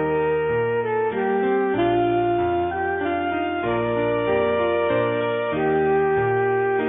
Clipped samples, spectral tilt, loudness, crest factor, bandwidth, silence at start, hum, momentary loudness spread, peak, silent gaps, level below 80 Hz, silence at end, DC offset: under 0.1%; -11 dB/octave; -22 LUFS; 10 dB; 3.9 kHz; 0 s; none; 4 LU; -10 dBFS; none; -48 dBFS; 0 s; under 0.1%